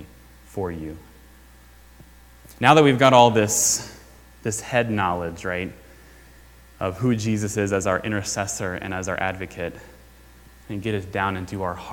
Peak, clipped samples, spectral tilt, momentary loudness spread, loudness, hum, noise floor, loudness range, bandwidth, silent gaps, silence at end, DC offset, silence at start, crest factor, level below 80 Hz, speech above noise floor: 0 dBFS; under 0.1%; -4 dB/octave; 18 LU; -22 LUFS; none; -49 dBFS; 10 LU; 19 kHz; none; 0 s; under 0.1%; 0 s; 24 dB; -50 dBFS; 27 dB